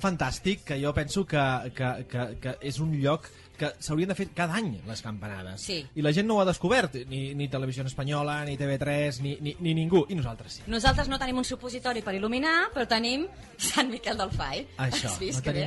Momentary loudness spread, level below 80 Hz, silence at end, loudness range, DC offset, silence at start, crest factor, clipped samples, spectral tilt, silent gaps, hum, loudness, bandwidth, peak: 10 LU; -44 dBFS; 0 s; 3 LU; under 0.1%; 0 s; 22 dB; under 0.1%; -5 dB/octave; none; none; -29 LUFS; 11.5 kHz; -8 dBFS